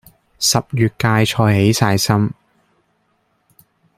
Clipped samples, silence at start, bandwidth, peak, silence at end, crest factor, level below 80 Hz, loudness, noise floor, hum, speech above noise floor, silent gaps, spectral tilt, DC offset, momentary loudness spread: under 0.1%; 0.4 s; 16 kHz; -2 dBFS; 1.65 s; 16 dB; -48 dBFS; -16 LUFS; -64 dBFS; none; 49 dB; none; -4.5 dB/octave; under 0.1%; 4 LU